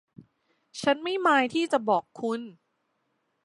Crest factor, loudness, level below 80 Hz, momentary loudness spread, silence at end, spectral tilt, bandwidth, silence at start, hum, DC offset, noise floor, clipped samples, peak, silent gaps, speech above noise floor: 20 dB; -26 LUFS; -76 dBFS; 13 LU; 0.9 s; -4 dB/octave; 11.5 kHz; 0.2 s; none; under 0.1%; -75 dBFS; under 0.1%; -8 dBFS; none; 50 dB